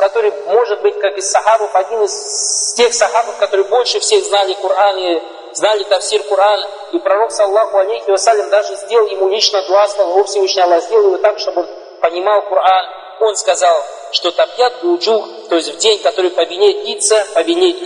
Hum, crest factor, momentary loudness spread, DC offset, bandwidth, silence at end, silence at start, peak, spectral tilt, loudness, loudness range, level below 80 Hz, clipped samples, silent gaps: none; 14 dB; 5 LU; under 0.1%; 10.5 kHz; 0 s; 0 s; 0 dBFS; 0.5 dB/octave; -13 LUFS; 1 LU; -68 dBFS; under 0.1%; none